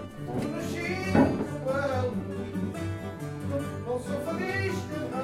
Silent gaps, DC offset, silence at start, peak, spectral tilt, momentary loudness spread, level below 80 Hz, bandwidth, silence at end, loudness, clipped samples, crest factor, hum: none; under 0.1%; 0 s; -10 dBFS; -6.5 dB/octave; 10 LU; -54 dBFS; 15.5 kHz; 0 s; -30 LUFS; under 0.1%; 20 dB; none